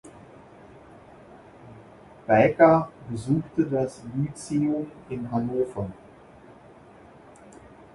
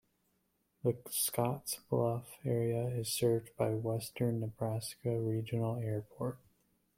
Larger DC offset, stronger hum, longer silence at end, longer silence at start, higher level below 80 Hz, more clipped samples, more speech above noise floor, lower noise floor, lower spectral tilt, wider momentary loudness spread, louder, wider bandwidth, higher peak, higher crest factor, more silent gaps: neither; neither; first, 2 s vs 0.6 s; second, 0.05 s vs 0.85 s; first, -56 dBFS vs -70 dBFS; neither; second, 26 dB vs 43 dB; second, -50 dBFS vs -78 dBFS; first, -7.5 dB/octave vs -5.5 dB/octave; first, 17 LU vs 7 LU; first, -24 LUFS vs -36 LUFS; second, 11.5 kHz vs 16.5 kHz; first, -4 dBFS vs -16 dBFS; about the same, 24 dB vs 20 dB; neither